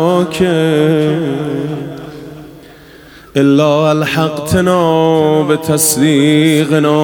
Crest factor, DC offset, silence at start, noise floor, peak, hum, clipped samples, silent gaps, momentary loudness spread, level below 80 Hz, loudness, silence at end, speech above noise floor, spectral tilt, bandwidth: 12 dB; under 0.1%; 0 s; -37 dBFS; 0 dBFS; none; under 0.1%; none; 12 LU; -46 dBFS; -12 LUFS; 0 s; 27 dB; -5 dB/octave; 19 kHz